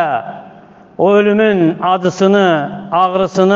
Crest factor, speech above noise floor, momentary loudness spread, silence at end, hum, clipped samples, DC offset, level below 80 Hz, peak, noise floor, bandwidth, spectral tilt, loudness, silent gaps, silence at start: 12 dB; 28 dB; 8 LU; 0 s; none; under 0.1%; under 0.1%; -56 dBFS; 0 dBFS; -40 dBFS; 7.6 kHz; -6.5 dB/octave; -13 LUFS; none; 0 s